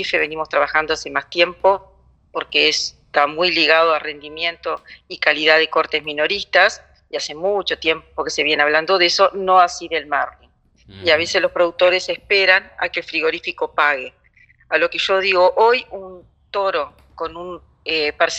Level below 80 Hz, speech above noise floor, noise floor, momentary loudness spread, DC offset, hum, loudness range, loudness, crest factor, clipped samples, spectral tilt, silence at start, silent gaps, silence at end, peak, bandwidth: -54 dBFS; 35 dB; -53 dBFS; 15 LU; under 0.1%; none; 2 LU; -17 LUFS; 18 dB; under 0.1%; -2 dB/octave; 0 s; none; 0 s; 0 dBFS; 8.6 kHz